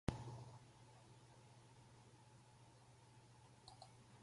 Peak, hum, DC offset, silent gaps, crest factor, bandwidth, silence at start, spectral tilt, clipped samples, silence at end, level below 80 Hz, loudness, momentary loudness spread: -24 dBFS; none; under 0.1%; none; 34 dB; 11.5 kHz; 0.05 s; -6 dB/octave; under 0.1%; 0 s; -66 dBFS; -61 LUFS; 11 LU